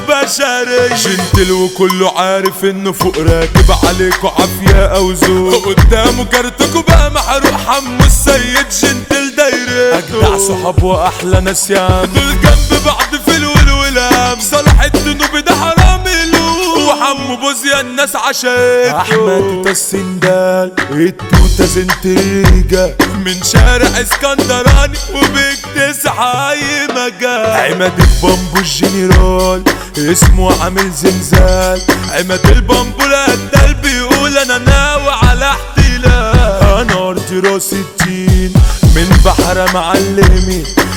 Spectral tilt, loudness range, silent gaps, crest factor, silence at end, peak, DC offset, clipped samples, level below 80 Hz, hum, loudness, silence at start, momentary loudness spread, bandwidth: -4.5 dB/octave; 2 LU; none; 10 dB; 0 s; 0 dBFS; under 0.1%; 0.5%; -14 dBFS; none; -10 LUFS; 0 s; 4 LU; 18.5 kHz